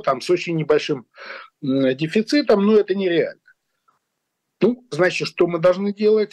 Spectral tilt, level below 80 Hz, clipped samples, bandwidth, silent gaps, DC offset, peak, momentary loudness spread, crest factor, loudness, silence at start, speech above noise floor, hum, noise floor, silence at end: -6 dB/octave; -64 dBFS; under 0.1%; 11.5 kHz; none; under 0.1%; -8 dBFS; 11 LU; 12 dB; -19 LUFS; 0.05 s; 58 dB; none; -77 dBFS; 0.05 s